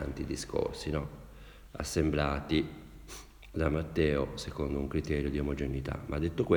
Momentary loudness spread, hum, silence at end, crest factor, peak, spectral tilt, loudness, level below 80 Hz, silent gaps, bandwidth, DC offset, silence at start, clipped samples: 18 LU; none; 0 s; 20 dB; -12 dBFS; -6 dB/octave; -33 LUFS; -44 dBFS; none; over 20 kHz; under 0.1%; 0 s; under 0.1%